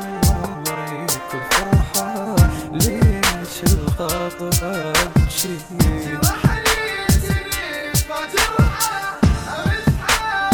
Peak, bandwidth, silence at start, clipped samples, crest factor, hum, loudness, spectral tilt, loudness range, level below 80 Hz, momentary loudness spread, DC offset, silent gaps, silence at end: -2 dBFS; 19.5 kHz; 0 s; under 0.1%; 18 dB; none; -19 LUFS; -4 dB/octave; 1 LU; -26 dBFS; 6 LU; under 0.1%; none; 0 s